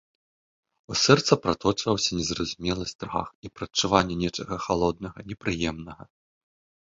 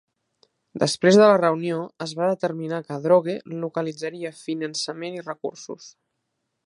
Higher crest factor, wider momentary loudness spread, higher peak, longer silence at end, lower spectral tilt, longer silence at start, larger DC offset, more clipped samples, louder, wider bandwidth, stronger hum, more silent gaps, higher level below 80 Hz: about the same, 24 dB vs 20 dB; about the same, 16 LU vs 17 LU; about the same, -2 dBFS vs -2 dBFS; about the same, 0.85 s vs 0.75 s; about the same, -4 dB/octave vs -5 dB/octave; first, 0.9 s vs 0.75 s; neither; neither; about the same, -25 LUFS vs -23 LUFS; second, 7.8 kHz vs 11.5 kHz; neither; first, 2.95-2.99 s, 3.35-3.43 s vs none; first, -48 dBFS vs -72 dBFS